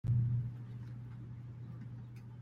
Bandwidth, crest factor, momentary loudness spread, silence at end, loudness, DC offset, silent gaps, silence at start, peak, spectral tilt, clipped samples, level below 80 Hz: 2.8 kHz; 14 dB; 15 LU; 0 s; -42 LUFS; under 0.1%; none; 0.05 s; -24 dBFS; -10 dB/octave; under 0.1%; -58 dBFS